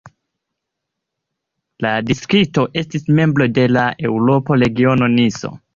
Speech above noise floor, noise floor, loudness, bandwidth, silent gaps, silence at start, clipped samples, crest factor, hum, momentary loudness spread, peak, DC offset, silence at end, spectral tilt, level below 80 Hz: 64 dB; -79 dBFS; -16 LUFS; 7.4 kHz; none; 0.05 s; under 0.1%; 14 dB; none; 6 LU; -2 dBFS; under 0.1%; 0.2 s; -6.5 dB/octave; -48 dBFS